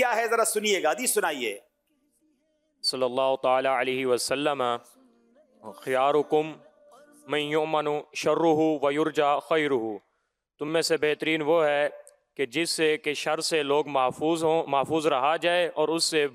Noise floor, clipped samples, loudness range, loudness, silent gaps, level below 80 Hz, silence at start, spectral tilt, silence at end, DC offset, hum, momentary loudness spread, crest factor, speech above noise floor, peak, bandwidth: -77 dBFS; under 0.1%; 3 LU; -25 LUFS; none; -76 dBFS; 0 s; -3 dB/octave; 0.05 s; under 0.1%; none; 7 LU; 14 dB; 52 dB; -12 dBFS; 16 kHz